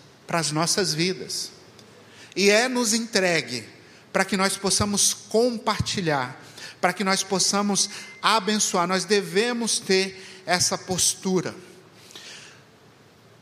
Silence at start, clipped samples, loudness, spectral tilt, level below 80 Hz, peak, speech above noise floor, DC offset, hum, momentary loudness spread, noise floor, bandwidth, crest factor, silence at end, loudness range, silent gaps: 0.3 s; under 0.1%; -23 LUFS; -2.5 dB/octave; -58 dBFS; -2 dBFS; 29 dB; under 0.1%; none; 13 LU; -53 dBFS; 15.5 kHz; 22 dB; 0.9 s; 2 LU; none